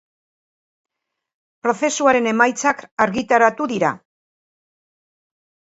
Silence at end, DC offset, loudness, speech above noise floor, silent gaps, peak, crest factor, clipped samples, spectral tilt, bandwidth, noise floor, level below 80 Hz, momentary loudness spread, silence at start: 1.75 s; under 0.1%; -18 LUFS; over 72 dB; 2.91-2.97 s; 0 dBFS; 20 dB; under 0.1%; -3.5 dB/octave; 8 kHz; under -90 dBFS; -64 dBFS; 7 LU; 1.65 s